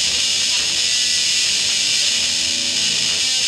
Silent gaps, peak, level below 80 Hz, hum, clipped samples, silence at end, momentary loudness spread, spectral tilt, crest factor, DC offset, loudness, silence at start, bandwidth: none; -4 dBFS; -52 dBFS; none; under 0.1%; 0 s; 2 LU; 1.5 dB/octave; 14 dB; under 0.1%; -15 LUFS; 0 s; 16 kHz